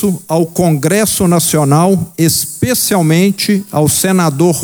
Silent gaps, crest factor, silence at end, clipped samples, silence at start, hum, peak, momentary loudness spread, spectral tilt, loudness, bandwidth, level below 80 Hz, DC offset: none; 10 dB; 0 s; under 0.1%; 0 s; none; 0 dBFS; 4 LU; -5 dB/octave; -11 LUFS; over 20 kHz; -44 dBFS; under 0.1%